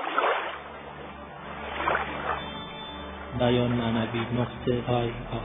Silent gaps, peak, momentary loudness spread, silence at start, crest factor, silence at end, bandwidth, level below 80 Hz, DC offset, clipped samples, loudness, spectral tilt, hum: none; -10 dBFS; 15 LU; 0 s; 18 dB; 0 s; 3.9 kHz; -48 dBFS; under 0.1%; under 0.1%; -29 LUFS; -10 dB/octave; none